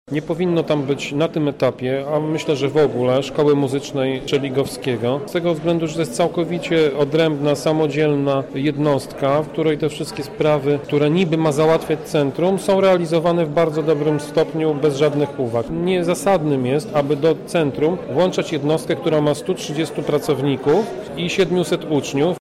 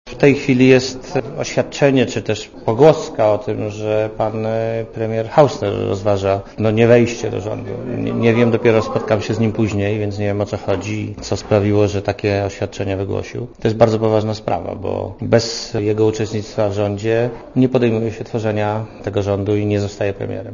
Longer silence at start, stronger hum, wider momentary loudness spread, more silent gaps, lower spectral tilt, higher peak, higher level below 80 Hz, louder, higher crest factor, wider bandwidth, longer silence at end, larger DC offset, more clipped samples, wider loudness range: about the same, 0.1 s vs 0.05 s; neither; second, 5 LU vs 10 LU; neither; about the same, -6 dB/octave vs -6.5 dB/octave; second, -8 dBFS vs 0 dBFS; second, -50 dBFS vs -44 dBFS; about the same, -19 LUFS vs -18 LUFS; about the same, 12 dB vs 16 dB; first, 14.5 kHz vs 7.4 kHz; about the same, 0 s vs 0 s; neither; neither; about the same, 2 LU vs 3 LU